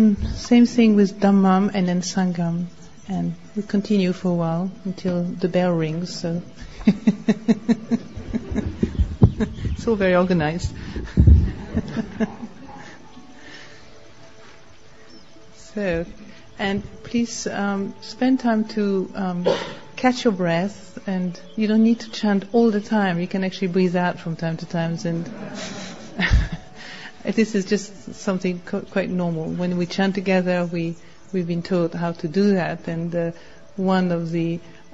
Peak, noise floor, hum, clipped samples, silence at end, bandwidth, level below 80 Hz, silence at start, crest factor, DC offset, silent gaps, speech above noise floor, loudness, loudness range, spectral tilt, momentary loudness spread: -2 dBFS; -49 dBFS; none; under 0.1%; 0.2 s; 8 kHz; -32 dBFS; 0 s; 20 dB; 0.7%; none; 28 dB; -22 LUFS; 7 LU; -6.5 dB/octave; 14 LU